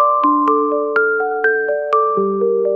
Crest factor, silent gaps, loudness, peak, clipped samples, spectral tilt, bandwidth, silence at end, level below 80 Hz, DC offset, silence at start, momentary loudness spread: 12 dB; none; -16 LUFS; -4 dBFS; under 0.1%; -8 dB/octave; 5 kHz; 0 s; -68 dBFS; 0.2%; 0 s; 3 LU